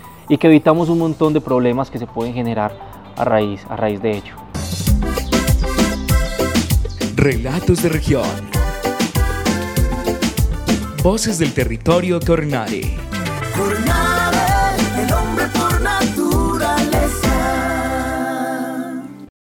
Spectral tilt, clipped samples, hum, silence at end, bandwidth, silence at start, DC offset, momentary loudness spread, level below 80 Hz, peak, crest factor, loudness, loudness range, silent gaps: -5.5 dB/octave; under 0.1%; none; 0.3 s; 19 kHz; 0 s; under 0.1%; 8 LU; -26 dBFS; 0 dBFS; 18 dB; -18 LUFS; 3 LU; none